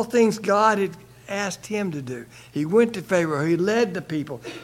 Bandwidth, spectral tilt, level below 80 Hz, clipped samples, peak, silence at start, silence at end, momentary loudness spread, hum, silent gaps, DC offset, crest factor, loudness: 16 kHz; -5.5 dB/octave; -62 dBFS; under 0.1%; -6 dBFS; 0 s; 0 s; 13 LU; none; none; under 0.1%; 18 dB; -23 LUFS